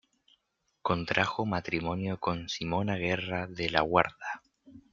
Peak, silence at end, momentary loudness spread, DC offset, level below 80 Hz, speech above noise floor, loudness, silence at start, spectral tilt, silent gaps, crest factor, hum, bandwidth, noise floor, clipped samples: -4 dBFS; 0.1 s; 9 LU; under 0.1%; -58 dBFS; 48 dB; -31 LUFS; 0.85 s; -5.5 dB/octave; none; 28 dB; none; 7.4 kHz; -78 dBFS; under 0.1%